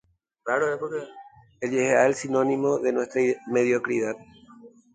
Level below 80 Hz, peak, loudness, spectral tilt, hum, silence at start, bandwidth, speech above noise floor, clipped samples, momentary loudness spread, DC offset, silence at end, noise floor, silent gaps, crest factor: -68 dBFS; -6 dBFS; -24 LUFS; -5.5 dB/octave; none; 0.45 s; 9.4 kHz; 26 dB; under 0.1%; 13 LU; under 0.1%; 0.25 s; -50 dBFS; none; 20 dB